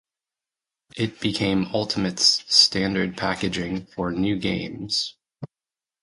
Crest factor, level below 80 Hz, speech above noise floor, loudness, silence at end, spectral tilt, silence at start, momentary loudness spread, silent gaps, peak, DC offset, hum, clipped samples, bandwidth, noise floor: 24 dB; -50 dBFS; over 67 dB; -22 LUFS; 0.55 s; -3.5 dB/octave; 0.95 s; 18 LU; none; -2 dBFS; under 0.1%; none; under 0.1%; 11.5 kHz; under -90 dBFS